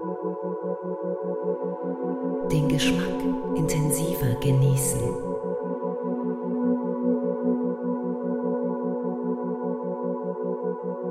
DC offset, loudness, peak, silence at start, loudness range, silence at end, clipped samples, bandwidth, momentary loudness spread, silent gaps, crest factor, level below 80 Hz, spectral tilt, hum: under 0.1%; -27 LUFS; -12 dBFS; 0 s; 4 LU; 0 s; under 0.1%; 16 kHz; 8 LU; none; 14 dB; -50 dBFS; -6 dB/octave; none